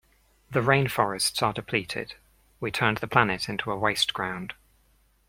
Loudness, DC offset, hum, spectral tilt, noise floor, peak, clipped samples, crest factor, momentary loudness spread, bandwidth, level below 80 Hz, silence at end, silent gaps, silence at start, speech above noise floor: -26 LUFS; under 0.1%; none; -4 dB/octave; -64 dBFS; -2 dBFS; under 0.1%; 26 dB; 12 LU; 16.5 kHz; -56 dBFS; 0.75 s; none; 0.5 s; 38 dB